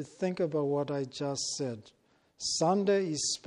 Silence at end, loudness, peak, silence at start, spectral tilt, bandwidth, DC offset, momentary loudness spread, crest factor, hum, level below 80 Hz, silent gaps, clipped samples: 0.1 s; -31 LUFS; -16 dBFS; 0 s; -4 dB/octave; 11 kHz; under 0.1%; 9 LU; 16 dB; none; -72 dBFS; none; under 0.1%